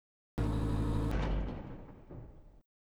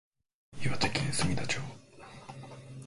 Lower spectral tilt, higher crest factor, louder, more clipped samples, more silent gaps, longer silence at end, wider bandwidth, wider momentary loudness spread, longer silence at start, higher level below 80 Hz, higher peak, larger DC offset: first, -8 dB/octave vs -4 dB/octave; second, 16 dB vs 22 dB; second, -36 LUFS vs -32 LUFS; neither; neither; first, 0.3 s vs 0 s; about the same, 11 kHz vs 11.5 kHz; about the same, 18 LU vs 19 LU; second, 0.35 s vs 0.5 s; first, -40 dBFS vs -54 dBFS; second, -22 dBFS vs -12 dBFS; neither